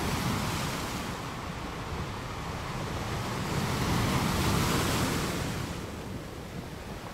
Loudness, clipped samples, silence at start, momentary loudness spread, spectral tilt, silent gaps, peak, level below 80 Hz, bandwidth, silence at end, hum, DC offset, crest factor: -32 LUFS; under 0.1%; 0 s; 12 LU; -4.5 dB/octave; none; -16 dBFS; -42 dBFS; 16 kHz; 0 s; none; under 0.1%; 16 dB